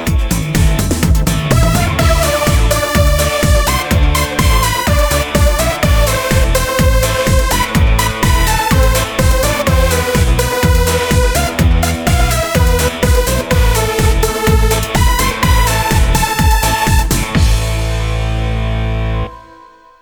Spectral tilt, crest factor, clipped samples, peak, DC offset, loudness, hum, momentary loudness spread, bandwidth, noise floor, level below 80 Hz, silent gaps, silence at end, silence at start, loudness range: -4.5 dB/octave; 12 dB; under 0.1%; 0 dBFS; under 0.1%; -13 LUFS; none; 3 LU; over 20 kHz; -40 dBFS; -16 dBFS; none; 0.6 s; 0 s; 1 LU